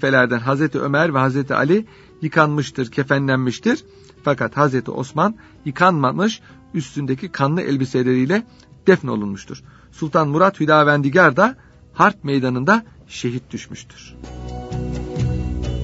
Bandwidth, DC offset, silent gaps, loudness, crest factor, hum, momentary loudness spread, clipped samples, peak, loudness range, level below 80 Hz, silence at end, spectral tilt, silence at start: 8 kHz; under 0.1%; none; -18 LUFS; 18 dB; none; 18 LU; under 0.1%; 0 dBFS; 5 LU; -40 dBFS; 0 s; -6.5 dB/octave; 0 s